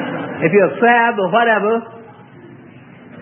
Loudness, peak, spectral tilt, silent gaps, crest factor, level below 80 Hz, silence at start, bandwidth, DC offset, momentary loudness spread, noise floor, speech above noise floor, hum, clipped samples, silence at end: -14 LUFS; 0 dBFS; -11 dB/octave; none; 16 dB; -68 dBFS; 0 s; 3.5 kHz; under 0.1%; 10 LU; -40 dBFS; 26 dB; none; under 0.1%; 0 s